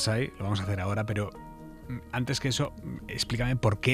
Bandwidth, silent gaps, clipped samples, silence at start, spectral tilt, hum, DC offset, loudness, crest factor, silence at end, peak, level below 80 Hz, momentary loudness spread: 14.5 kHz; none; under 0.1%; 0 s; -5 dB/octave; none; under 0.1%; -31 LUFS; 20 dB; 0 s; -10 dBFS; -46 dBFS; 13 LU